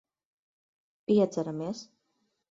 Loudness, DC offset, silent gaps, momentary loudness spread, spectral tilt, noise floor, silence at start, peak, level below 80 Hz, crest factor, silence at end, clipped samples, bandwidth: -29 LUFS; under 0.1%; none; 16 LU; -7 dB/octave; -77 dBFS; 1.1 s; -14 dBFS; -74 dBFS; 18 dB; 0.7 s; under 0.1%; 7.8 kHz